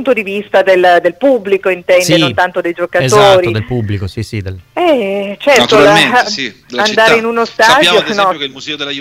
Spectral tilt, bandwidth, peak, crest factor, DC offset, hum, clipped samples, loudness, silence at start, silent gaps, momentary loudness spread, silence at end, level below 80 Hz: -4 dB/octave; 16.5 kHz; 0 dBFS; 10 dB; under 0.1%; none; under 0.1%; -10 LUFS; 0 s; none; 13 LU; 0 s; -44 dBFS